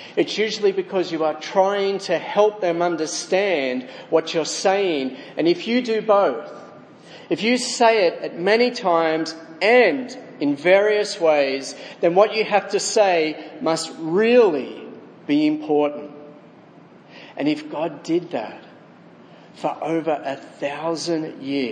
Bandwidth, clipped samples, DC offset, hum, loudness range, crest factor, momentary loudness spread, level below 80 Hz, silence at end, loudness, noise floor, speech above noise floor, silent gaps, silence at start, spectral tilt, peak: 10.5 kHz; under 0.1%; under 0.1%; none; 8 LU; 18 dB; 12 LU; -80 dBFS; 0 s; -20 LUFS; -47 dBFS; 26 dB; none; 0 s; -4 dB/octave; -2 dBFS